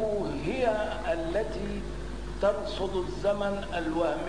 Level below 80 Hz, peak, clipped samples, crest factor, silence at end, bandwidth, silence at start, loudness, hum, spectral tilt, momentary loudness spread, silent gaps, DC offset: -42 dBFS; -14 dBFS; under 0.1%; 18 dB; 0 s; 10.5 kHz; 0 s; -31 LUFS; none; -6 dB/octave; 8 LU; none; 0.8%